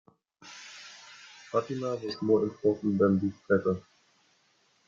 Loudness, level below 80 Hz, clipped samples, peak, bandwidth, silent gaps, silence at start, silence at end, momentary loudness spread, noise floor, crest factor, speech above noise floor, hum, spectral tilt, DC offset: -29 LUFS; -70 dBFS; under 0.1%; -12 dBFS; 7.6 kHz; none; 0.45 s; 1.05 s; 21 LU; -68 dBFS; 20 dB; 41 dB; none; -7 dB/octave; under 0.1%